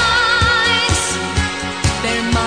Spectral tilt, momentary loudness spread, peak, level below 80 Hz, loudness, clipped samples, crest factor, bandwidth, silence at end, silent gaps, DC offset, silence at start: -3 dB/octave; 6 LU; -2 dBFS; -28 dBFS; -15 LUFS; under 0.1%; 14 dB; 10 kHz; 0 s; none; 0.5%; 0 s